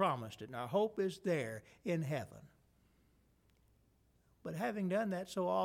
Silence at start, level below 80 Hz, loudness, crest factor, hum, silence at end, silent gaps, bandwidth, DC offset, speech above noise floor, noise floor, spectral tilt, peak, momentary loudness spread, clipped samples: 0 s; -74 dBFS; -39 LUFS; 18 dB; none; 0 s; none; 16.5 kHz; under 0.1%; 35 dB; -72 dBFS; -6.5 dB/octave; -22 dBFS; 10 LU; under 0.1%